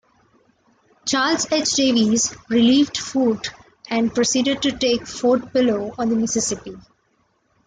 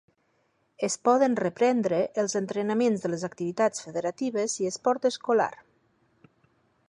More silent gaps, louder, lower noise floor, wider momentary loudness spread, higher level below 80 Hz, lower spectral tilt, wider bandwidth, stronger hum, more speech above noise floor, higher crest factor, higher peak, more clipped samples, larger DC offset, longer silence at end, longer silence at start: neither; first, -19 LUFS vs -27 LUFS; second, -65 dBFS vs -71 dBFS; about the same, 8 LU vs 8 LU; first, -54 dBFS vs -74 dBFS; second, -3 dB/octave vs -4.5 dB/octave; second, 9.6 kHz vs 11 kHz; neither; about the same, 46 dB vs 45 dB; about the same, 14 dB vs 18 dB; first, -6 dBFS vs -10 dBFS; neither; neither; second, 0.85 s vs 1.35 s; first, 1.05 s vs 0.8 s